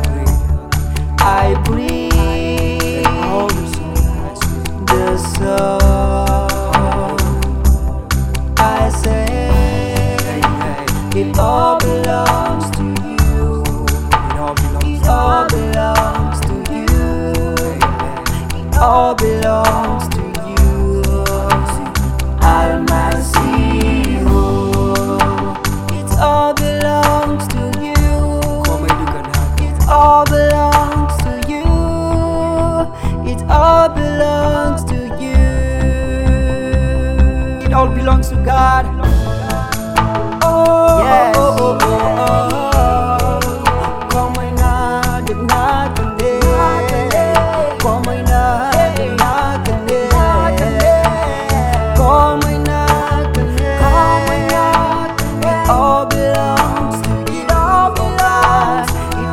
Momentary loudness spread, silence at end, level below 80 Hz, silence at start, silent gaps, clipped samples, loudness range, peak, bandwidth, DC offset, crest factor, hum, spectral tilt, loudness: 7 LU; 0 s; -18 dBFS; 0 s; none; under 0.1%; 3 LU; 0 dBFS; 15.5 kHz; 3%; 14 dB; none; -5.5 dB/octave; -14 LUFS